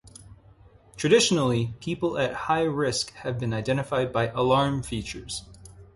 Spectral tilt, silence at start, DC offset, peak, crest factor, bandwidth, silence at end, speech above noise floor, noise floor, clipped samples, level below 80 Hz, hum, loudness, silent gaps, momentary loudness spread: -4.5 dB/octave; 0.05 s; under 0.1%; -6 dBFS; 20 dB; 11.5 kHz; 0.1 s; 29 dB; -54 dBFS; under 0.1%; -50 dBFS; none; -25 LUFS; none; 12 LU